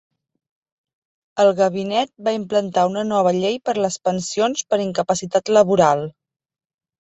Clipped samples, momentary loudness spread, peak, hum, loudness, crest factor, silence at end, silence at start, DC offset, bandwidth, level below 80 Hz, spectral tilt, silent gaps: under 0.1%; 7 LU; -2 dBFS; none; -19 LUFS; 18 dB; 0.9 s; 1.35 s; under 0.1%; 8.2 kHz; -62 dBFS; -4.5 dB/octave; none